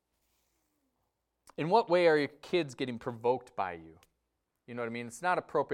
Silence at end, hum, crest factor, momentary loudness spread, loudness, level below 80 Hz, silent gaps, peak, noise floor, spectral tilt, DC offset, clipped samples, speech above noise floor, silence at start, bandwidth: 0 s; none; 20 dB; 13 LU; -31 LUFS; -74 dBFS; none; -14 dBFS; -83 dBFS; -5.5 dB/octave; under 0.1%; under 0.1%; 52 dB; 1.6 s; 13 kHz